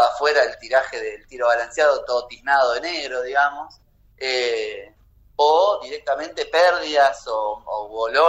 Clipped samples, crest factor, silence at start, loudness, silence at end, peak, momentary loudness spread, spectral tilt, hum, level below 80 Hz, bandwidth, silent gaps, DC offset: under 0.1%; 14 dB; 0 s; -21 LUFS; 0 s; -6 dBFS; 12 LU; -1.5 dB/octave; none; -56 dBFS; 10.5 kHz; none; under 0.1%